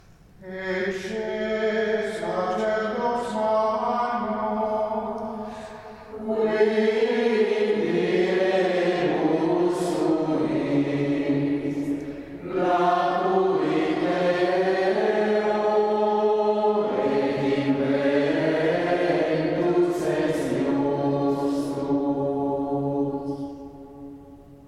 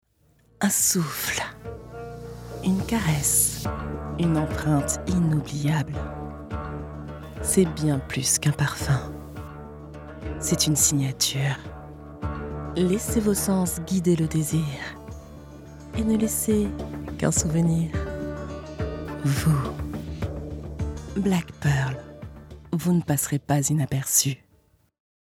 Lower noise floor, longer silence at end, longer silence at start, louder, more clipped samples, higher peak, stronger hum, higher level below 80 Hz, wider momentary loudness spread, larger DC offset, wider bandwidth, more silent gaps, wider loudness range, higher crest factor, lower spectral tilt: second, -46 dBFS vs -62 dBFS; second, 0 s vs 0.85 s; second, 0.4 s vs 0.6 s; about the same, -24 LUFS vs -24 LUFS; neither; about the same, -8 dBFS vs -6 dBFS; neither; second, -58 dBFS vs -42 dBFS; second, 9 LU vs 18 LU; neither; second, 12.5 kHz vs 17 kHz; neither; about the same, 4 LU vs 3 LU; about the same, 16 dB vs 20 dB; first, -6.5 dB/octave vs -4.5 dB/octave